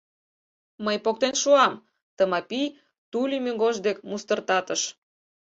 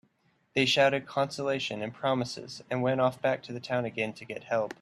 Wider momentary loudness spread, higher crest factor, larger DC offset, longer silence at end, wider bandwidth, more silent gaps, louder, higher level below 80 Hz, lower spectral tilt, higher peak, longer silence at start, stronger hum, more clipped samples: about the same, 12 LU vs 10 LU; about the same, 20 dB vs 20 dB; neither; first, 0.65 s vs 0.1 s; second, 8 kHz vs 13 kHz; first, 2.03-2.17 s, 2.98-3.12 s vs none; first, -25 LUFS vs -29 LUFS; about the same, -74 dBFS vs -70 dBFS; second, -2.5 dB/octave vs -4.5 dB/octave; first, -6 dBFS vs -10 dBFS; first, 0.8 s vs 0.55 s; neither; neither